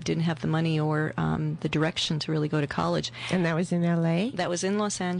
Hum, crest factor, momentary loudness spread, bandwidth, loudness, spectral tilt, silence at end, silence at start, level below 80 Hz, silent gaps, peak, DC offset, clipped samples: none; 12 dB; 3 LU; 10 kHz; -27 LUFS; -5.5 dB/octave; 0 s; 0 s; -58 dBFS; none; -16 dBFS; under 0.1%; under 0.1%